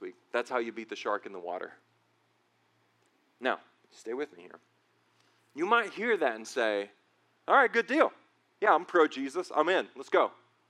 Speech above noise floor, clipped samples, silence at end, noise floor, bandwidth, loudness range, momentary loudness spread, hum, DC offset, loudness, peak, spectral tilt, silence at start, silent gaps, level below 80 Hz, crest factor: 42 dB; under 0.1%; 0.35 s; -72 dBFS; 12 kHz; 13 LU; 15 LU; none; under 0.1%; -30 LUFS; -10 dBFS; -3.5 dB/octave; 0 s; none; under -90 dBFS; 22 dB